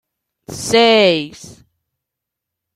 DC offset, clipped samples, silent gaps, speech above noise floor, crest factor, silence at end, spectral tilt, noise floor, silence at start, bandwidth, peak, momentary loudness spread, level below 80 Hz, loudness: under 0.1%; under 0.1%; none; 67 dB; 18 dB; 1.25 s; -3.5 dB/octave; -82 dBFS; 0.5 s; 14 kHz; 0 dBFS; 20 LU; -54 dBFS; -13 LUFS